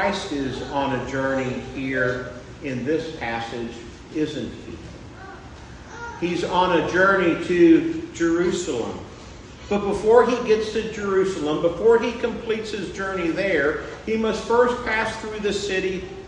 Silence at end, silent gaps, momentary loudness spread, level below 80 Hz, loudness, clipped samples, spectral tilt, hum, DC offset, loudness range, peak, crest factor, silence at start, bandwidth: 0 s; none; 20 LU; -46 dBFS; -22 LUFS; under 0.1%; -5.5 dB/octave; none; under 0.1%; 9 LU; -2 dBFS; 20 dB; 0 s; 10.5 kHz